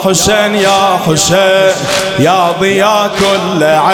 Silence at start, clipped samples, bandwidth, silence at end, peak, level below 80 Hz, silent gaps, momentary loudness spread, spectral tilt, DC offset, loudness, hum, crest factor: 0 s; under 0.1%; 19 kHz; 0 s; 0 dBFS; -40 dBFS; none; 3 LU; -3.5 dB/octave; under 0.1%; -9 LUFS; none; 10 dB